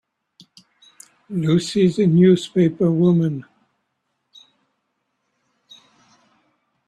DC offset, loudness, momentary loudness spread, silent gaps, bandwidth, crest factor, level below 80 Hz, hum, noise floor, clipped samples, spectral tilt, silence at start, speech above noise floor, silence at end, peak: under 0.1%; -18 LUFS; 10 LU; none; 10 kHz; 18 dB; -60 dBFS; none; -74 dBFS; under 0.1%; -7.5 dB/octave; 1.3 s; 57 dB; 3.45 s; -4 dBFS